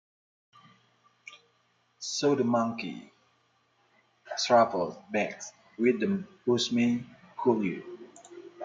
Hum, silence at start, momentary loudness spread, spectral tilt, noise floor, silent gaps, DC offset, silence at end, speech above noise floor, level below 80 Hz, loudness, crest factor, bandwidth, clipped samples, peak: none; 1.25 s; 23 LU; -4.5 dB/octave; -70 dBFS; none; under 0.1%; 0 s; 43 dB; -76 dBFS; -28 LUFS; 22 dB; 9.2 kHz; under 0.1%; -10 dBFS